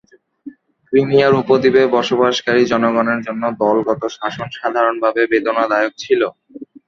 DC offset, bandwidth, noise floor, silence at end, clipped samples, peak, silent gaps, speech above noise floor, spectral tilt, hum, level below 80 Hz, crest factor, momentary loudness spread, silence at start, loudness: under 0.1%; 7.4 kHz; -38 dBFS; 0.25 s; under 0.1%; 0 dBFS; none; 23 dB; -5.5 dB/octave; none; -56 dBFS; 16 dB; 8 LU; 0.45 s; -16 LUFS